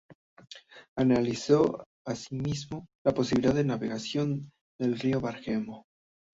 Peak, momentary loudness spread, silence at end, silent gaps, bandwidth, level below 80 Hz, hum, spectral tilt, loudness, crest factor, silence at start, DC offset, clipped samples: -10 dBFS; 19 LU; 0.55 s; 0.15-0.37 s, 0.88-0.96 s, 1.86-2.05 s, 2.95-3.05 s, 4.61-4.79 s; 8 kHz; -58 dBFS; none; -6.5 dB/octave; -29 LUFS; 20 dB; 0.1 s; under 0.1%; under 0.1%